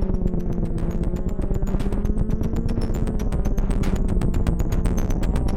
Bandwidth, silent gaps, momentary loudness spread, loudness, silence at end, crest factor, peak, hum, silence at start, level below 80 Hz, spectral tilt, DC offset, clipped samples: 14.5 kHz; none; 3 LU; -25 LUFS; 0 s; 16 dB; -6 dBFS; none; 0 s; -22 dBFS; -8 dB/octave; under 0.1%; under 0.1%